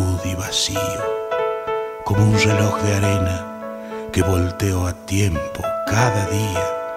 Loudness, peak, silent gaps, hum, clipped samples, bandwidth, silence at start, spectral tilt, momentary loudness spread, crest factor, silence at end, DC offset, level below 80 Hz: -20 LUFS; -4 dBFS; none; none; under 0.1%; 15.5 kHz; 0 s; -5 dB/octave; 8 LU; 16 dB; 0 s; under 0.1%; -40 dBFS